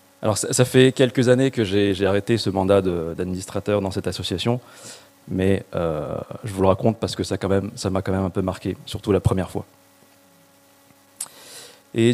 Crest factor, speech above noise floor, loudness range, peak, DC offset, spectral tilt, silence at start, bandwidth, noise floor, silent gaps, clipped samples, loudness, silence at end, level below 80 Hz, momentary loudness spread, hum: 20 dB; 33 dB; 7 LU; -2 dBFS; under 0.1%; -5.5 dB/octave; 0.2 s; 15.5 kHz; -54 dBFS; none; under 0.1%; -22 LUFS; 0 s; -48 dBFS; 16 LU; none